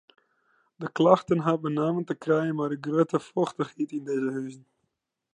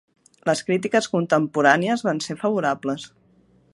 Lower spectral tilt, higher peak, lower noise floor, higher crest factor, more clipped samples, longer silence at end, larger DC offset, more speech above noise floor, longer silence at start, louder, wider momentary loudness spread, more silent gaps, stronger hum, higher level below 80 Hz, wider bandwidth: first, -7.5 dB/octave vs -5 dB/octave; second, -4 dBFS vs 0 dBFS; first, -80 dBFS vs -58 dBFS; about the same, 22 dB vs 22 dB; neither; about the same, 0.75 s vs 0.65 s; neither; first, 54 dB vs 36 dB; first, 0.8 s vs 0.45 s; second, -27 LUFS vs -22 LUFS; about the same, 12 LU vs 11 LU; neither; neither; second, -74 dBFS vs -68 dBFS; about the same, 10.5 kHz vs 11.5 kHz